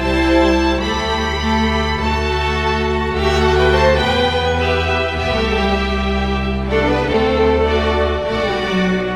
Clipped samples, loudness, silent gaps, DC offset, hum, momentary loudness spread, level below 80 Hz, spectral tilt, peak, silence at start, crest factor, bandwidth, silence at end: under 0.1%; -16 LUFS; none; under 0.1%; none; 5 LU; -24 dBFS; -5.5 dB/octave; -2 dBFS; 0 s; 14 dB; 12 kHz; 0 s